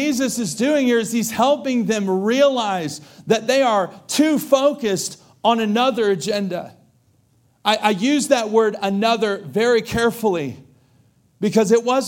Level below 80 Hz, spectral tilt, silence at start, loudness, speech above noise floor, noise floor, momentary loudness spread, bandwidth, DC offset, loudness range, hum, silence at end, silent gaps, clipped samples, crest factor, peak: -56 dBFS; -4 dB/octave; 0 s; -19 LUFS; 41 dB; -59 dBFS; 8 LU; 17 kHz; under 0.1%; 2 LU; none; 0 s; none; under 0.1%; 16 dB; -2 dBFS